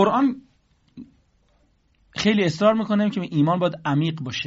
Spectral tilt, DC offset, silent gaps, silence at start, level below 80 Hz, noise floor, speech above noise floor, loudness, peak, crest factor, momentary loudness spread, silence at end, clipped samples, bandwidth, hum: -5 dB/octave; under 0.1%; none; 0 s; -58 dBFS; -62 dBFS; 42 dB; -21 LUFS; -6 dBFS; 18 dB; 6 LU; 0 s; under 0.1%; 8 kHz; none